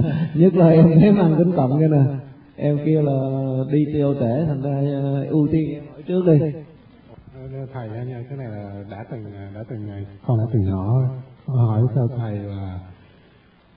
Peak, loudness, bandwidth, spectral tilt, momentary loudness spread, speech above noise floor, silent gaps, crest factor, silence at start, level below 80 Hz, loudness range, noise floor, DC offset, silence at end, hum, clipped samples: -2 dBFS; -19 LUFS; 4.5 kHz; -14 dB/octave; 19 LU; 34 dB; none; 18 dB; 0 s; -50 dBFS; 12 LU; -53 dBFS; under 0.1%; 0.85 s; none; under 0.1%